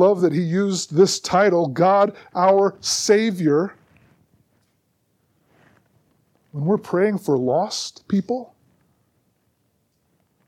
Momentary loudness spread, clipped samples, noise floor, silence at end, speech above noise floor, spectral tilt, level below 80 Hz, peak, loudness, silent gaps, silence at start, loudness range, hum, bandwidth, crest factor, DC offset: 9 LU; under 0.1%; -68 dBFS; 2 s; 49 dB; -5 dB/octave; -66 dBFS; -4 dBFS; -20 LUFS; none; 0 s; 10 LU; none; 15 kHz; 18 dB; under 0.1%